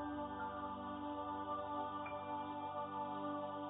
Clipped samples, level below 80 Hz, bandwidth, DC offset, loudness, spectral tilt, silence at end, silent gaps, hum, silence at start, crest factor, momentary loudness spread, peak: under 0.1%; -68 dBFS; 3.9 kHz; under 0.1%; -44 LUFS; -2.5 dB/octave; 0 s; none; none; 0 s; 12 dB; 2 LU; -32 dBFS